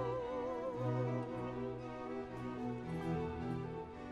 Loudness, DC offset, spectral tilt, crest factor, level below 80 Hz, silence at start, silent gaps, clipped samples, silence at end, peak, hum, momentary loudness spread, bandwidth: -42 LUFS; under 0.1%; -8.5 dB/octave; 14 dB; -60 dBFS; 0 s; none; under 0.1%; 0 s; -26 dBFS; none; 6 LU; 11 kHz